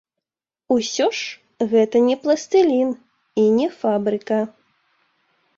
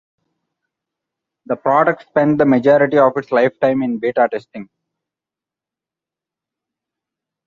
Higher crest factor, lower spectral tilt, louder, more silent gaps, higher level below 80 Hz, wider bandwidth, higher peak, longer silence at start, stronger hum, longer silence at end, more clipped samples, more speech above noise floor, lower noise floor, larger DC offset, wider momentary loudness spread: about the same, 16 dB vs 18 dB; second, -4.5 dB/octave vs -8.5 dB/octave; second, -20 LUFS vs -15 LUFS; neither; about the same, -66 dBFS vs -62 dBFS; first, 7.8 kHz vs 7 kHz; second, -6 dBFS vs -2 dBFS; second, 0.7 s vs 1.5 s; neither; second, 1.1 s vs 2.85 s; neither; about the same, 70 dB vs 73 dB; about the same, -89 dBFS vs -88 dBFS; neither; about the same, 11 LU vs 12 LU